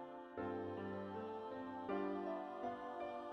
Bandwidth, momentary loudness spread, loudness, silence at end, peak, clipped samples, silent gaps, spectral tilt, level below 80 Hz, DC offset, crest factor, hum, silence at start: 9.8 kHz; 5 LU; -46 LUFS; 0 s; -30 dBFS; under 0.1%; none; -8 dB/octave; -80 dBFS; under 0.1%; 16 dB; none; 0 s